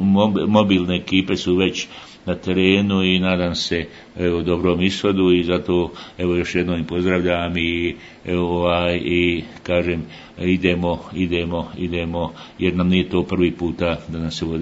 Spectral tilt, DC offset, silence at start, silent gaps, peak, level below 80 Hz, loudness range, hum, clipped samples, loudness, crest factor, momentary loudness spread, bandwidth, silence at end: -6 dB/octave; under 0.1%; 0 s; none; 0 dBFS; -46 dBFS; 3 LU; none; under 0.1%; -20 LUFS; 20 dB; 10 LU; 8 kHz; 0 s